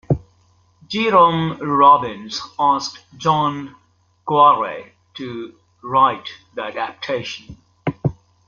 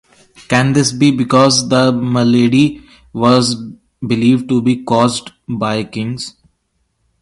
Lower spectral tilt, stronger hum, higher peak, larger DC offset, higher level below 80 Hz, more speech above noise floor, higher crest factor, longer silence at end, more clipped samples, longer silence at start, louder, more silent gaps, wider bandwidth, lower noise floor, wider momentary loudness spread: about the same, -5.5 dB/octave vs -5 dB/octave; first, 50 Hz at -60 dBFS vs none; about the same, 0 dBFS vs 0 dBFS; neither; about the same, -50 dBFS vs -48 dBFS; second, 39 dB vs 52 dB; about the same, 18 dB vs 14 dB; second, 0.35 s vs 0.9 s; neither; second, 0.1 s vs 0.5 s; second, -18 LUFS vs -13 LUFS; neither; second, 7.2 kHz vs 11.5 kHz; second, -57 dBFS vs -65 dBFS; first, 20 LU vs 14 LU